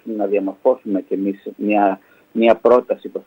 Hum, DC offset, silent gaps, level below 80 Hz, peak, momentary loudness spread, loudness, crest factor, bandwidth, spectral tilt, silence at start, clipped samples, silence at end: none; under 0.1%; none; -64 dBFS; -2 dBFS; 11 LU; -18 LUFS; 16 dB; 16 kHz; -8 dB/octave; 0.05 s; under 0.1%; 0.05 s